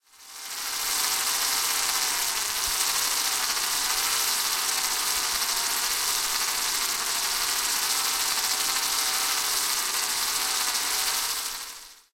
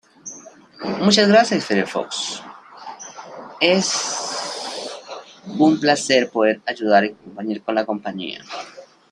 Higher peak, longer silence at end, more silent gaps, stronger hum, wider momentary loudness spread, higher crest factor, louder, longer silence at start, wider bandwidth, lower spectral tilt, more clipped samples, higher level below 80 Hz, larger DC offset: second, -8 dBFS vs -2 dBFS; about the same, 0.2 s vs 0.3 s; neither; neither; second, 3 LU vs 21 LU; about the same, 18 dB vs 20 dB; second, -24 LUFS vs -19 LUFS; about the same, 0.2 s vs 0.25 s; first, 17 kHz vs 11 kHz; second, 2.5 dB/octave vs -3.5 dB/octave; neither; first, -56 dBFS vs -66 dBFS; neither